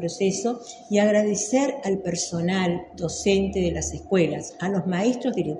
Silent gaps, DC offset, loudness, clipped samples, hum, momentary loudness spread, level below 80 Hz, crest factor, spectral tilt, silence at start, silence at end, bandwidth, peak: none; under 0.1%; -24 LUFS; under 0.1%; none; 8 LU; -46 dBFS; 16 dB; -5 dB/octave; 0 s; 0 s; 11 kHz; -8 dBFS